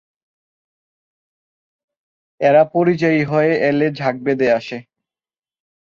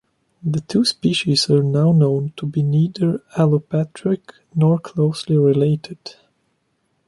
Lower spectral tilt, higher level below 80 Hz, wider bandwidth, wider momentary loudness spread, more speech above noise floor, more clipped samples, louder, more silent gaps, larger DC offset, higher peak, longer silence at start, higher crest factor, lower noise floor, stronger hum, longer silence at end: about the same, -7.5 dB/octave vs -6.5 dB/octave; about the same, -62 dBFS vs -58 dBFS; second, 7.2 kHz vs 11.5 kHz; about the same, 7 LU vs 9 LU; first, over 74 dB vs 50 dB; neither; about the same, -16 LUFS vs -18 LUFS; neither; neither; about the same, -2 dBFS vs -4 dBFS; first, 2.4 s vs 0.45 s; about the same, 18 dB vs 16 dB; first, under -90 dBFS vs -68 dBFS; neither; first, 1.1 s vs 0.95 s